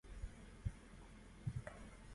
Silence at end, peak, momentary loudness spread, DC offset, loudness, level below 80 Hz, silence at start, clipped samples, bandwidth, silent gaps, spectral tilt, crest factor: 0 s; -30 dBFS; 12 LU; under 0.1%; -53 LUFS; -56 dBFS; 0.05 s; under 0.1%; 11.5 kHz; none; -6.5 dB/octave; 22 dB